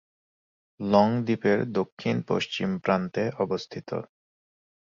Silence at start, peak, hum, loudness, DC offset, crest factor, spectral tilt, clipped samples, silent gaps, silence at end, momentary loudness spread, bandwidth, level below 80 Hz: 0.8 s; -6 dBFS; none; -27 LUFS; under 0.1%; 22 dB; -7 dB/octave; under 0.1%; 1.92-1.97 s; 0.9 s; 13 LU; 7.6 kHz; -62 dBFS